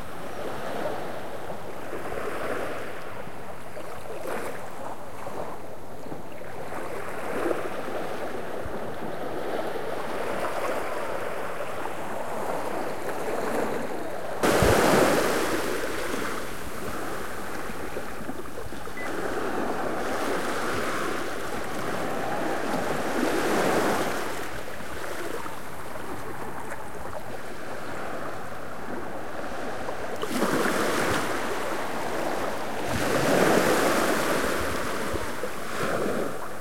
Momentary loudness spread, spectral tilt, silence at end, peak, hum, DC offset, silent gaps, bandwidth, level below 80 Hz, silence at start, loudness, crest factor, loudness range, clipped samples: 13 LU; -4 dB/octave; 0 s; -8 dBFS; none; 3%; none; 16.5 kHz; -50 dBFS; 0 s; -29 LUFS; 22 dB; 11 LU; under 0.1%